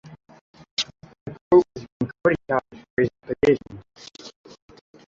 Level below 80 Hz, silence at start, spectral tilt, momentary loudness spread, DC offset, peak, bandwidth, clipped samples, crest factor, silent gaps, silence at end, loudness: -54 dBFS; 0.1 s; -5.5 dB/octave; 24 LU; under 0.1%; -4 dBFS; 7.6 kHz; under 0.1%; 20 dB; 0.41-0.54 s, 0.71-0.77 s, 1.21-1.26 s, 1.41-1.51 s, 1.92-2.00 s, 2.90-2.97 s; 0.85 s; -23 LUFS